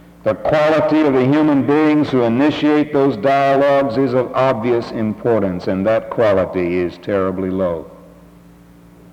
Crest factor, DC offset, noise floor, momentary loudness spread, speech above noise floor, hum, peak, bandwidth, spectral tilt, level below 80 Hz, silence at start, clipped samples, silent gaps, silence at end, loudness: 14 dB; under 0.1%; -44 dBFS; 6 LU; 28 dB; none; -2 dBFS; 8.4 kHz; -8 dB/octave; -50 dBFS; 0.25 s; under 0.1%; none; 1.15 s; -16 LUFS